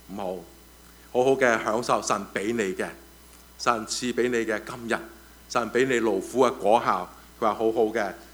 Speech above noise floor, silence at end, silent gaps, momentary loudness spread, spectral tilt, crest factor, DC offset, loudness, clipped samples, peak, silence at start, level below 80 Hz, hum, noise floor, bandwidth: 25 dB; 0 s; none; 11 LU; -4 dB/octave; 20 dB; under 0.1%; -25 LUFS; under 0.1%; -6 dBFS; 0.1 s; -56 dBFS; none; -50 dBFS; over 20 kHz